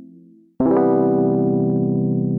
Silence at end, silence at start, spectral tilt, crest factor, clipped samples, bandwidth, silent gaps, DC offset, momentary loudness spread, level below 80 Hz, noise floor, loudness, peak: 0 s; 0 s; -14.5 dB/octave; 12 dB; under 0.1%; 2.4 kHz; none; under 0.1%; 4 LU; -52 dBFS; -48 dBFS; -18 LUFS; -6 dBFS